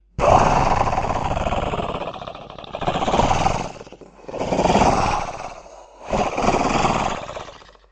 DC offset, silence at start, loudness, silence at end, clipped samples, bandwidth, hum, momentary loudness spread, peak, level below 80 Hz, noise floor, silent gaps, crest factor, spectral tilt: under 0.1%; 0.2 s; -20 LUFS; 0.3 s; under 0.1%; 8.8 kHz; none; 19 LU; 0 dBFS; -32 dBFS; -41 dBFS; none; 20 dB; -5 dB/octave